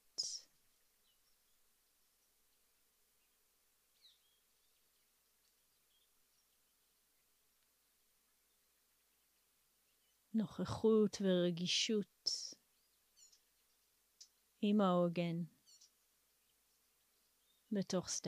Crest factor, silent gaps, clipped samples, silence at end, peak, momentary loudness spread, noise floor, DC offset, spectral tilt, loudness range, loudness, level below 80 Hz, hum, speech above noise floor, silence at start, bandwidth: 20 dB; none; under 0.1%; 0 s; -24 dBFS; 10 LU; -78 dBFS; under 0.1%; -4.5 dB/octave; 10 LU; -38 LUFS; -80 dBFS; none; 42 dB; 0.2 s; 15.5 kHz